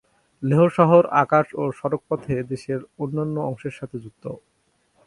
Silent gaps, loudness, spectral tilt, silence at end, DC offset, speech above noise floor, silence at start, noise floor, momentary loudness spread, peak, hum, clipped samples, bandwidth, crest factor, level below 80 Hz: none; -21 LUFS; -8.5 dB/octave; 0.7 s; under 0.1%; 45 dB; 0.4 s; -66 dBFS; 19 LU; -2 dBFS; none; under 0.1%; 11 kHz; 20 dB; -58 dBFS